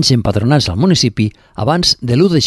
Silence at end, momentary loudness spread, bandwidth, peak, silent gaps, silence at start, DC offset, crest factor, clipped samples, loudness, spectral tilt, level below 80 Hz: 0 s; 7 LU; 12.5 kHz; 0 dBFS; none; 0 s; under 0.1%; 12 dB; under 0.1%; -13 LUFS; -5 dB/octave; -34 dBFS